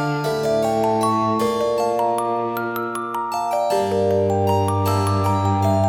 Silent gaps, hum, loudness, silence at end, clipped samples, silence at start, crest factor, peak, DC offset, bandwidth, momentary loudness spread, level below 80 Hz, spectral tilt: none; none; -20 LUFS; 0 s; under 0.1%; 0 s; 12 dB; -6 dBFS; under 0.1%; 18.5 kHz; 5 LU; -54 dBFS; -6.5 dB/octave